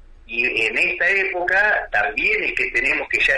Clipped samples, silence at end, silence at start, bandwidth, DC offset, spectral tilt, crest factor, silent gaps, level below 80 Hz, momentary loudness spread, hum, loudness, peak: under 0.1%; 0 s; 0.3 s; 11.5 kHz; under 0.1%; -2.5 dB/octave; 12 dB; none; -44 dBFS; 3 LU; none; -18 LUFS; -8 dBFS